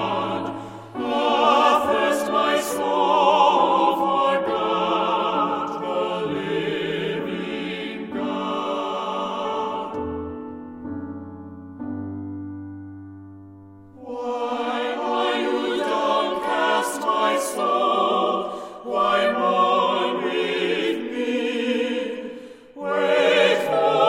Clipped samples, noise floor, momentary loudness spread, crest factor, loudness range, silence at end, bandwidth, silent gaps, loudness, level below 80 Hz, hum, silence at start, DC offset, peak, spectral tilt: under 0.1%; -44 dBFS; 17 LU; 18 dB; 12 LU; 0 s; 16 kHz; none; -22 LUFS; -60 dBFS; none; 0 s; under 0.1%; -4 dBFS; -4 dB/octave